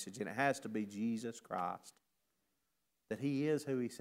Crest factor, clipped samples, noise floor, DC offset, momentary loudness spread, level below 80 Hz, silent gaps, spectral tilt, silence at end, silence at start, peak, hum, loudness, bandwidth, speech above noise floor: 22 dB; under 0.1%; -85 dBFS; under 0.1%; 7 LU; -84 dBFS; none; -5.5 dB/octave; 0 s; 0 s; -18 dBFS; none; -39 LUFS; 16 kHz; 47 dB